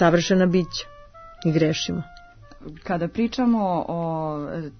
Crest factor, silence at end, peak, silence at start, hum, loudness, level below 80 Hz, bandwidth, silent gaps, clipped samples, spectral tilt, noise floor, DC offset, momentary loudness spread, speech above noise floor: 18 dB; 0.05 s; -6 dBFS; 0 s; none; -23 LUFS; -48 dBFS; 6.6 kHz; none; under 0.1%; -6 dB/octave; -45 dBFS; under 0.1%; 20 LU; 23 dB